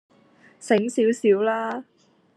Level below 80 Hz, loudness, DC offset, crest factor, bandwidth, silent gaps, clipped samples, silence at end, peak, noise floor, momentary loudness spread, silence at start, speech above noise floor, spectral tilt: -80 dBFS; -22 LUFS; under 0.1%; 18 dB; 12 kHz; none; under 0.1%; 0.55 s; -6 dBFS; -55 dBFS; 14 LU; 0.6 s; 34 dB; -5 dB/octave